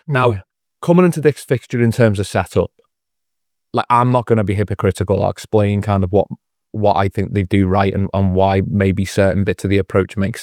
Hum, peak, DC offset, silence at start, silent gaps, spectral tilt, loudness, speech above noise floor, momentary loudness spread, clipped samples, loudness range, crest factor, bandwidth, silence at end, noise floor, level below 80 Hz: none; 0 dBFS; under 0.1%; 0.1 s; none; -7.5 dB/octave; -16 LUFS; 65 dB; 7 LU; under 0.1%; 2 LU; 16 dB; 14 kHz; 0 s; -81 dBFS; -48 dBFS